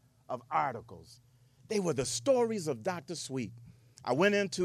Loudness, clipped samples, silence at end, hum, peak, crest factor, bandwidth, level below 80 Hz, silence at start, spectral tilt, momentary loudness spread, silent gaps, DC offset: -32 LUFS; under 0.1%; 0 s; none; -14 dBFS; 20 dB; 15.5 kHz; -68 dBFS; 0.3 s; -4.5 dB/octave; 15 LU; none; under 0.1%